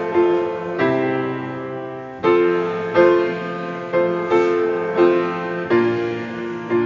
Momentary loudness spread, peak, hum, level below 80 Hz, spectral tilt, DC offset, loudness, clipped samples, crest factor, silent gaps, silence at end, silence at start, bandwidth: 11 LU; -2 dBFS; none; -58 dBFS; -7.5 dB/octave; under 0.1%; -19 LUFS; under 0.1%; 16 dB; none; 0 s; 0 s; 7.2 kHz